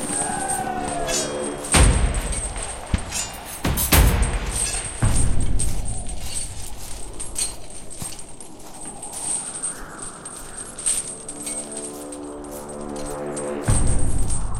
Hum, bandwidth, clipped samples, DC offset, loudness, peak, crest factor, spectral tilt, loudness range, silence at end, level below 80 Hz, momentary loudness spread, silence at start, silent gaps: none; 16 kHz; under 0.1%; under 0.1%; -24 LUFS; -2 dBFS; 20 dB; -3.5 dB/octave; 8 LU; 0 s; -26 dBFS; 15 LU; 0 s; none